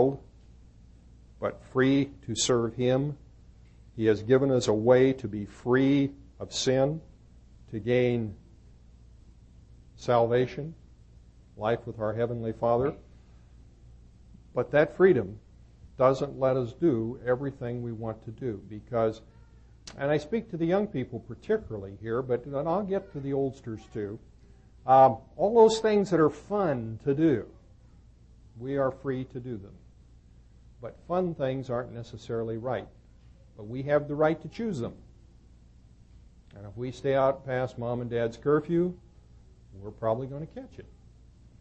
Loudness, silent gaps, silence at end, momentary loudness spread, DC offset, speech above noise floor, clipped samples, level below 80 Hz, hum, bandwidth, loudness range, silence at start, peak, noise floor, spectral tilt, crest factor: -28 LUFS; none; 0.7 s; 18 LU; under 0.1%; 28 dB; under 0.1%; -54 dBFS; none; 8.6 kHz; 9 LU; 0 s; -8 dBFS; -55 dBFS; -6 dB/octave; 22 dB